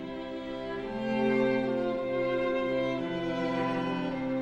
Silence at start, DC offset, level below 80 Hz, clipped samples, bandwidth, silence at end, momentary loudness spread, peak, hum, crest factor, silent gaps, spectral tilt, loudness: 0 s; under 0.1%; -56 dBFS; under 0.1%; 8.4 kHz; 0 s; 9 LU; -16 dBFS; none; 14 dB; none; -7 dB/octave; -31 LUFS